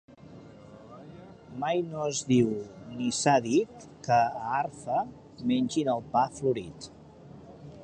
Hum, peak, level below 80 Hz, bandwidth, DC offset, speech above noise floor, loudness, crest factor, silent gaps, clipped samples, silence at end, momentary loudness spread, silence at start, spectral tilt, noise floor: none; -10 dBFS; -62 dBFS; 9.8 kHz; under 0.1%; 22 dB; -28 LUFS; 20 dB; none; under 0.1%; 0 s; 24 LU; 0.2 s; -5 dB/octave; -49 dBFS